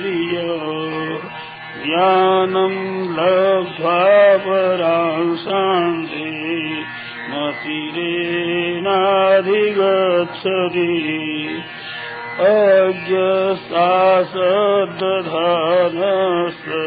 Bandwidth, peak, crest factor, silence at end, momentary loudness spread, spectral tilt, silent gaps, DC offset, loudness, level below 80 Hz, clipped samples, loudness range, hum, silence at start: 5 kHz; -2 dBFS; 16 dB; 0 s; 12 LU; -9.5 dB/octave; none; under 0.1%; -17 LUFS; -64 dBFS; under 0.1%; 5 LU; none; 0 s